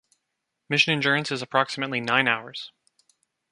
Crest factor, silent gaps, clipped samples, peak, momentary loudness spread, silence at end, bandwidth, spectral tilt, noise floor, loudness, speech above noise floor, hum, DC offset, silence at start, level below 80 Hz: 22 dB; none; under 0.1%; -4 dBFS; 15 LU; 0.85 s; 11.5 kHz; -4 dB/octave; -81 dBFS; -23 LUFS; 56 dB; none; under 0.1%; 0.7 s; -72 dBFS